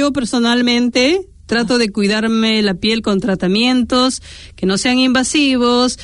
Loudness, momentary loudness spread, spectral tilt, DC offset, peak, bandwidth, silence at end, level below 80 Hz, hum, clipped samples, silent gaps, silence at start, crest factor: -14 LUFS; 5 LU; -4 dB/octave; under 0.1%; -2 dBFS; 11 kHz; 0 s; -42 dBFS; none; under 0.1%; none; 0 s; 12 dB